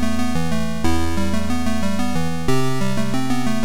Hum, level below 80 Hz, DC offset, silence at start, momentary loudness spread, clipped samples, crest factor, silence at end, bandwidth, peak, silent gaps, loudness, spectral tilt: none; -34 dBFS; 10%; 0 s; 1 LU; under 0.1%; 14 dB; 0 s; over 20 kHz; -4 dBFS; none; -22 LUFS; -5.5 dB/octave